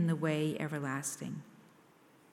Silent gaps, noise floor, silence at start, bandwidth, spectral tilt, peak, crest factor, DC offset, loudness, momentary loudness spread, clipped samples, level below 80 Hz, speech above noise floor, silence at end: none; -63 dBFS; 0 s; 15.5 kHz; -5.5 dB/octave; -20 dBFS; 16 dB; under 0.1%; -36 LUFS; 11 LU; under 0.1%; -80 dBFS; 27 dB; 0.7 s